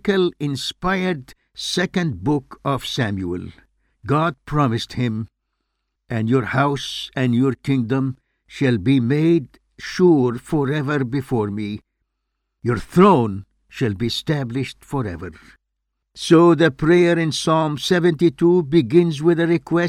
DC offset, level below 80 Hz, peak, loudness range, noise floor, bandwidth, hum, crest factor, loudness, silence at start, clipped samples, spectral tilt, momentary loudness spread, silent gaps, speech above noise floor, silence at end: under 0.1%; -48 dBFS; 0 dBFS; 7 LU; -76 dBFS; 14 kHz; none; 18 dB; -19 LUFS; 0.05 s; under 0.1%; -6.5 dB/octave; 14 LU; none; 58 dB; 0 s